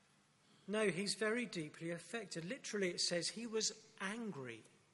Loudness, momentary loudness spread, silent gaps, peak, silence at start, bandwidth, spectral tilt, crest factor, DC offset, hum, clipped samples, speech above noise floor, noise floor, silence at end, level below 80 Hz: -41 LUFS; 10 LU; none; -22 dBFS; 0.65 s; 11.5 kHz; -3 dB/octave; 20 dB; under 0.1%; none; under 0.1%; 31 dB; -72 dBFS; 0.25 s; -88 dBFS